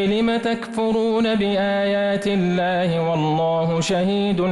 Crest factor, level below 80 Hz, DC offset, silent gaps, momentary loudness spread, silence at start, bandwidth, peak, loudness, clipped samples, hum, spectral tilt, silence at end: 8 dB; -52 dBFS; under 0.1%; none; 1 LU; 0 s; 11.5 kHz; -12 dBFS; -20 LUFS; under 0.1%; none; -6 dB/octave; 0 s